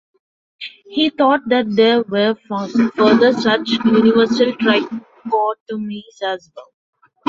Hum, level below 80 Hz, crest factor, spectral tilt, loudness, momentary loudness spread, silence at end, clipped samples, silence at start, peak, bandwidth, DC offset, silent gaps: none; -60 dBFS; 16 dB; -5.5 dB/octave; -16 LUFS; 16 LU; 0.65 s; under 0.1%; 0.6 s; 0 dBFS; 7.4 kHz; under 0.1%; 5.60-5.66 s